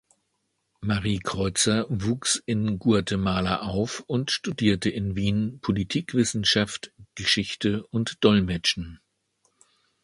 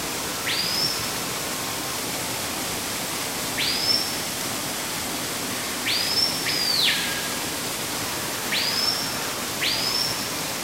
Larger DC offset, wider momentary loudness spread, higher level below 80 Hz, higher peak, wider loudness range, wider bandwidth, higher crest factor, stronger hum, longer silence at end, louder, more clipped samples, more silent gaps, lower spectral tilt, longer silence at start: second, under 0.1% vs 0.1%; about the same, 7 LU vs 6 LU; first, -46 dBFS vs -54 dBFS; first, -4 dBFS vs -8 dBFS; about the same, 2 LU vs 3 LU; second, 11.5 kHz vs 16 kHz; about the same, 22 dB vs 18 dB; neither; first, 1.1 s vs 0 s; about the same, -25 LUFS vs -23 LUFS; neither; neither; first, -4.5 dB/octave vs -1 dB/octave; first, 0.8 s vs 0 s